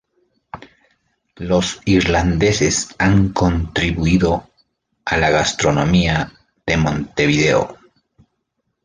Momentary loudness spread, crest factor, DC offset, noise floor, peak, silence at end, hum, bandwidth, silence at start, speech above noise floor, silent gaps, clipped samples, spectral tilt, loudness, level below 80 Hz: 14 LU; 16 dB; under 0.1%; -73 dBFS; -2 dBFS; 1.1 s; none; 10 kHz; 0.55 s; 56 dB; none; under 0.1%; -5 dB/octave; -17 LUFS; -32 dBFS